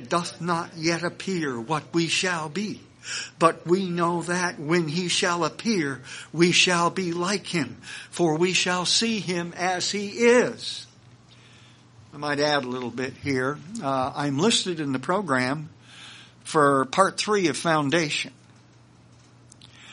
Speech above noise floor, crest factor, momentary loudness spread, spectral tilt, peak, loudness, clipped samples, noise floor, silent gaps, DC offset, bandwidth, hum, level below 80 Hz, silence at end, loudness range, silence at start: 29 dB; 22 dB; 13 LU; -4 dB/octave; -2 dBFS; -24 LUFS; under 0.1%; -53 dBFS; none; under 0.1%; 10.5 kHz; none; -66 dBFS; 0 s; 4 LU; 0 s